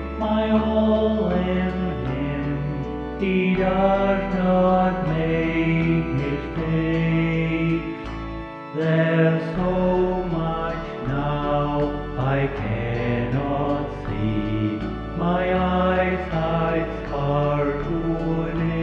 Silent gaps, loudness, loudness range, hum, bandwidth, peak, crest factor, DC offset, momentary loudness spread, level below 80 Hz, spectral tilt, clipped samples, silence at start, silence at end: none; -23 LUFS; 3 LU; none; 6.2 kHz; -6 dBFS; 16 dB; under 0.1%; 7 LU; -36 dBFS; -9 dB/octave; under 0.1%; 0 s; 0 s